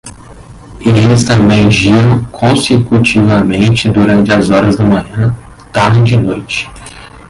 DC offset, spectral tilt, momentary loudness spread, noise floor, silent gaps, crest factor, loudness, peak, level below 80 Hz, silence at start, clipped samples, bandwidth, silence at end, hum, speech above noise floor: under 0.1%; -6 dB/octave; 10 LU; -32 dBFS; none; 10 dB; -9 LUFS; 0 dBFS; -32 dBFS; 0.05 s; under 0.1%; 11.5 kHz; 0.2 s; none; 24 dB